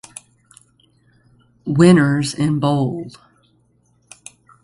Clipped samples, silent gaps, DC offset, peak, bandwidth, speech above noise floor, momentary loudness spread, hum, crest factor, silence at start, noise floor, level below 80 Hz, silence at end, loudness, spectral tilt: under 0.1%; none; under 0.1%; 0 dBFS; 11.5 kHz; 44 dB; 28 LU; none; 20 dB; 1.65 s; -60 dBFS; -54 dBFS; 1.55 s; -16 LUFS; -6.5 dB/octave